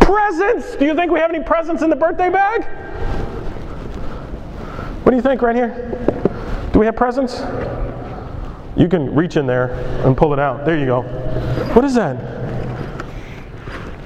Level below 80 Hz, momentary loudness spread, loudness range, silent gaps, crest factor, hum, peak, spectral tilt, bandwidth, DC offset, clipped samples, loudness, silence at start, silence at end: -28 dBFS; 15 LU; 3 LU; none; 18 dB; none; 0 dBFS; -7.5 dB/octave; 9.6 kHz; under 0.1%; under 0.1%; -17 LUFS; 0 s; 0 s